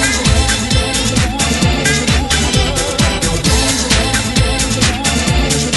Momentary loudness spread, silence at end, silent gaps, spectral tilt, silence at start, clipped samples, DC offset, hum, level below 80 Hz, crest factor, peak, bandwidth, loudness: 2 LU; 0 s; none; -3.5 dB/octave; 0 s; under 0.1%; under 0.1%; none; -20 dBFS; 14 dB; 0 dBFS; 12 kHz; -13 LUFS